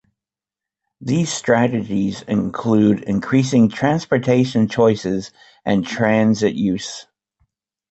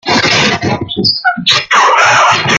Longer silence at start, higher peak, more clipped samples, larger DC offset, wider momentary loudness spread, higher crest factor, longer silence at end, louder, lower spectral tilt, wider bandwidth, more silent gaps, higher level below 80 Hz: first, 1 s vs 0.05 s; about the same, -2 dBFS vs 0 dBFS; neither; neither; first, 10 LU vs 6 LU; first, 16 dB vs 10 dB; first, 0.9 s vs 0 s; second, -18 LUFS vs -9 LUFS; first, -6 dB/octave vs -2.5 dB/octave; second, 8.2 kHz vs 16 kHz; neither; second, -52 dBFS vs -44 dBFS